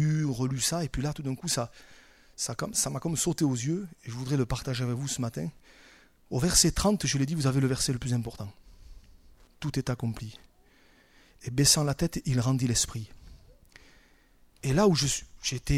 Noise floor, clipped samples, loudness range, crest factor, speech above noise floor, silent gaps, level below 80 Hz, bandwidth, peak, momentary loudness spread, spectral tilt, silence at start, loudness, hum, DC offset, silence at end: -60 dBFS; under 0.1%; 5 LU; 22 dB; 32 dB; none; -46 dBFS; 16 kHz; -8 dBFS; 15 LU; -4 dB/octave; 0 s; -28 LUFS; none; under 0.1%; 0 s